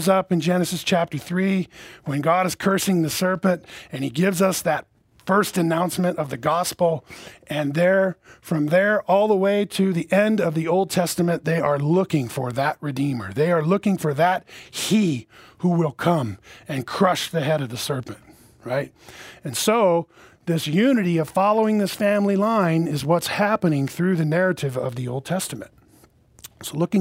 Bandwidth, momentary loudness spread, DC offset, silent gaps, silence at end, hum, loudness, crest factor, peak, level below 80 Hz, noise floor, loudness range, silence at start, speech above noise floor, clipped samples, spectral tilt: 16 kHz; 11 LU; under 0.1%; none; 0 s; none; -22 LUFS; 18 dB; -4 dBFS; -60 dBFS; -55 dBFS; 4 LU; 0 s; 33 dB; under 0.1%; -5.5 dB/octave